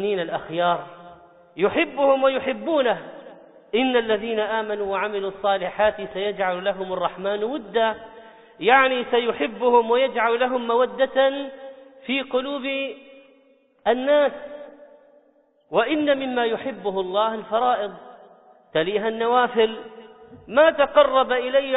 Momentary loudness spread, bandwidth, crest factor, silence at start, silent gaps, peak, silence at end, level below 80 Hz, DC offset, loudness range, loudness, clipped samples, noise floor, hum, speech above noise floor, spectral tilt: 11 LU; 4 kHz; 18 dB; 0 s; none; -4 dBFS; 0 s; -60 dBFS; under 0.1%; 5 LU; -22 LUFS; under 0.1%; -60 dBFS; none; 39 dB; -1.5 dB/octave